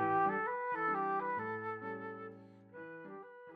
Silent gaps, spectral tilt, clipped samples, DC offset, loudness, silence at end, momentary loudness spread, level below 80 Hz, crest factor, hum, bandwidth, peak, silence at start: none; -8.5 dB/octave; under 0.1%; under 0.1%; -37 LUFS; 0 s; 18 LU; -84 dBFS; 16 dB; none; 5.2 kHz; -24 dBFS; 0 s